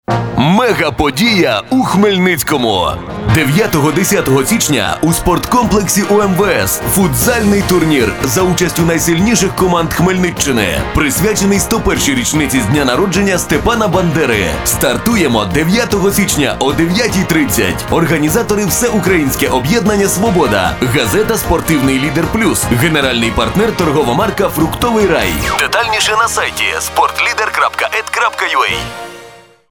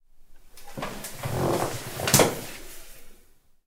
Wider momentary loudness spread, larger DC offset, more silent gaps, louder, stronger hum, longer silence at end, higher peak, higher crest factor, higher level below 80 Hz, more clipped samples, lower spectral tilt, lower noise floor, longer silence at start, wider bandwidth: second, 3 LU vs 23 LU; neither; neither; first, -12 LUFS vs -26 LUFS; neither; about the same, 0.35 s vs 0.45 s; about the same, 0 dBFS vs -2 dBFS; second, 12 dB vs 28 dB; first, -30 dBFS vs -48 dBFS; neither; about the same, -4 dB/octave vs -3.5 dB/octave; second, -38 dBFS vs -55 dBFS; about the same, 0.1 s vs 0.15 s; first, 19.5 kHz vs 16 kHz